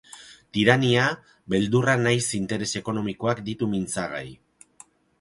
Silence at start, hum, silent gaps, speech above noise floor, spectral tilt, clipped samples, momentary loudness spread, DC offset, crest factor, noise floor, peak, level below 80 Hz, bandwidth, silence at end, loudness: 0.15 s; none; none; 30 dB; -5 dB/octave; under 0.1%; 15 LU; under 0.1%; 22 dB; -54 dBFS; -2 dBFS; -56 dBFS; 11.5 kHz; 0.85 s; -24 LUFS